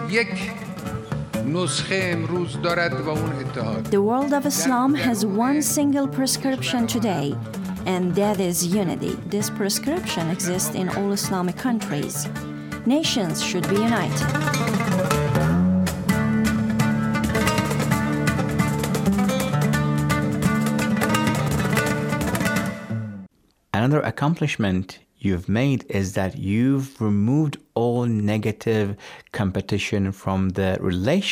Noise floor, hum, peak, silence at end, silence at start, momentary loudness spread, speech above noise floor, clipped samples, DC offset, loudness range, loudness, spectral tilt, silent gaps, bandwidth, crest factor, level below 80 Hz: -51 dBFS; none; -6 dBFS; 0 s; 0 s; 7 LU; 29 dB; under 0.1%; under 0.1%; 3 LU; -22 LUFS; -5 dB/octave; none; 18 kHz; 16 dB; -46 dBFS